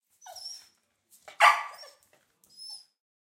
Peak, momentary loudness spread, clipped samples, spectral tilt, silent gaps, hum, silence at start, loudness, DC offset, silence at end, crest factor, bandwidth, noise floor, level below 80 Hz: -6 dBFS; 25 LU; under 0.1%; 3 dB/octave; none; none; 0.35 s; -23 LUFS; under 0.1%; 0.5 s; 26 dB; 16.5 kHz; -66 dBFS; -90 dBFS